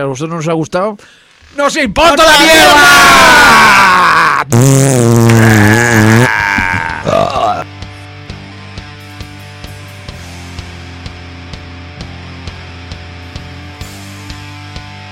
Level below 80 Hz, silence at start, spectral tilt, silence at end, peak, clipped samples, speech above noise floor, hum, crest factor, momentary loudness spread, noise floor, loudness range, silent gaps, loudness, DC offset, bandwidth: -34 dBFS; 0 s; -4 dB/octave; 0 s; 0 dBFS; 0.3%; 22 dB; none; 10 dB; 26 LU; -28 dBFS; 24 LU; none; -6 LUFS; under 0.1%; 17.5 kHz